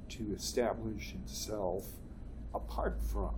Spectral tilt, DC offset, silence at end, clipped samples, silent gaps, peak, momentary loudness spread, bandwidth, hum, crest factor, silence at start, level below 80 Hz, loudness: -5 dB/octave; under 0.1%; 0 s; under 0.1%; none; -20 dBFS; 14 LU; 18 kHz; none; 18 dB; 0 s; -42 dBFS; -39 LUFS